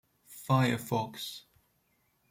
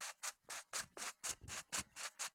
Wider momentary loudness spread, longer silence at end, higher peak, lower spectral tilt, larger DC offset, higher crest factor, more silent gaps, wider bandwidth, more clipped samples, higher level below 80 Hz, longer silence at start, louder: first, 20 LU vs 4 LU; first, 0.9 s vs 0.05 s; first, -14 dBFS vs -28 dBFS; first, -5.5 dB/octave vs 0 dB/octave; neither; about the same, 20 dB vs 20 dB; neither; second, 16.5 kHz vs 19 kHz; neither; about the same, -70 dBFS vs -72 dBFS; first, 0.3 s vs 0 s; first, -31 LUFS vs -46 LUFS